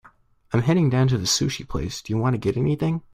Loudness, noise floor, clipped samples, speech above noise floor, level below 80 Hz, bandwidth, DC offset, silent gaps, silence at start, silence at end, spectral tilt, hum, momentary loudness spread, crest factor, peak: -23 LUFS; -55 dBFS; under 0.1%; 33 dB; -44 dBFS; 15 kHz; under 0.1%; none; 0.5 s; 0.15 s; -5.5 dB/octave; none; 8 LU; 16 dB; -6 dBFS